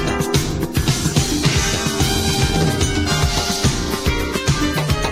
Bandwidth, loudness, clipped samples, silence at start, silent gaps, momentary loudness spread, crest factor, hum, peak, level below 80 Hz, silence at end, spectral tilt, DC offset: 16 kHz; -18 LUFS; under 0.1%; 0 s; none; 3 LU; 16 dB; none; -2 dBFS; -26 dBFS; 0 s; -4 dB/octave; under 0.1%